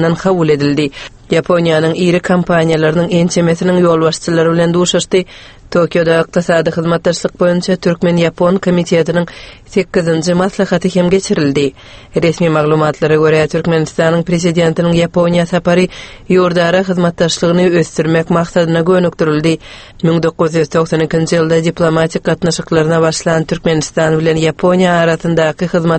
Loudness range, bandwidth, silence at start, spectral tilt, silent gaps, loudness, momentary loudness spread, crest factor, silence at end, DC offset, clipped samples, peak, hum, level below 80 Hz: 2 LU; 8.8 kHz; 0 s; -6 dB/octave; none; -12 LUFS; 4 LU; 12 dB; 0 s; under 0.1%; under 0.1%; 0 dBFS; none; -40 dBFS